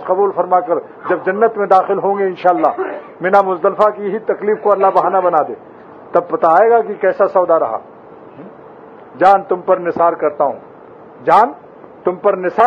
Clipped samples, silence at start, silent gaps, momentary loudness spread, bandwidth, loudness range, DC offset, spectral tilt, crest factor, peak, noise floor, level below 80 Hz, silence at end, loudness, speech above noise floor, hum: under 0.1%; 0 s; none; 9 LU; 7.6 kHz; 2 LU; under 0.1%; -7.5 dB/octave; 14 dB; 0 dBFS; -38 dBFS; -64 dBFS; 0 s; -14 LUFS; 24 dB; none